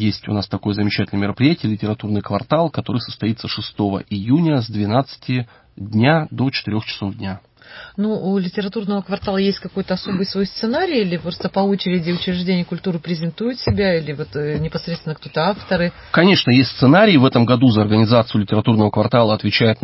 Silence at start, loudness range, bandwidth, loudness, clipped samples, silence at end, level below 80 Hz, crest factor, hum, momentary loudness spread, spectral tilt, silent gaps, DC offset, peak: 0 s; 8 LU; 5.8 kHz; -18 LUFS; under 0.1%; 0.1 s; -44 dBFS; 16 dB; none; 11 LU; -10.5 dB/octave; none; under 0.1%; -2 dBFS